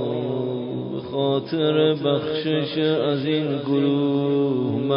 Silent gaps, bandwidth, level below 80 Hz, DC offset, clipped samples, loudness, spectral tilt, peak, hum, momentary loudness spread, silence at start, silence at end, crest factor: none; 5.4 kHz; -62 dBFS; under 0.1%; under 0.1%; -22 LUFS; -11.5 dB/octave; -8 dBFS; none; 7 LU; 0 s; 0 s; 14 dB